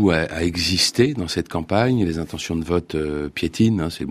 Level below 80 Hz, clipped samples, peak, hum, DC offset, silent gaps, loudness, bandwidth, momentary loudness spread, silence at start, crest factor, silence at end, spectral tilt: -44 dBFS; under 0.1%; -2 dBFS; none; under 0.1%; none; -21 LUFS; 15.5 kHz; 8 LU; 0 s; 18 dB; 0 s; -5 dB/octave